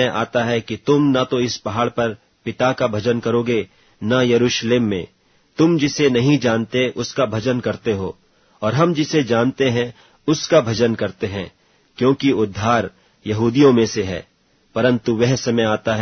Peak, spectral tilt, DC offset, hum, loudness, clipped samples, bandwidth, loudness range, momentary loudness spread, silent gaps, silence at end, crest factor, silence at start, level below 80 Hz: -2 dBFS; -5.5 dB/octave; under 0.1%; none; -18 LUFS; under 0.1%; 6.6 kHz; 2 LU; 11 LU; none; 0 s; 18 dB; 0 s; -52 dBFS